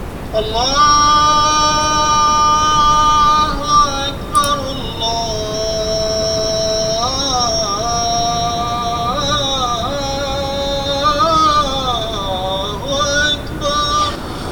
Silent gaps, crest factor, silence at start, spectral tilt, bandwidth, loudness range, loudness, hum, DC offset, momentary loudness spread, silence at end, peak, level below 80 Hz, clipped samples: none; 14 dB; 0 s; -3 dB/octave; 19 kHz; 5 LU; -15 LUFS; none; under 0.1%; 9 LU; 0 s; -2 dBFS; -30 dBFS; under 0.1%